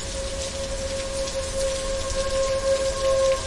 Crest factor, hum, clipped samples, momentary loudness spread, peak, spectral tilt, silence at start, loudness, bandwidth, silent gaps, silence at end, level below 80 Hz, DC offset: 14 dB; none; under 0.1%; 7 LU; -12 dBFS; -3 dB/octave; 0 s; -25 LUFS; 11.5 kHz; none; 0 s; -34 dBFS; under 0.1%